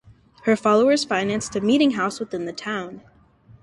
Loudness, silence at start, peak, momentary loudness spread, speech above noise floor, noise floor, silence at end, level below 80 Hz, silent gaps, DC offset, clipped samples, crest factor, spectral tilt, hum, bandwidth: -21 LUFS; 0.45 s; -6 dBFS; 12 LU; 31 dB; -52 dBFS; 0.65 s; -60 dBFS; none; under 0.1%; under 0.1%; 18 dB; -4.5 dB/octave; none; 11.5 kHz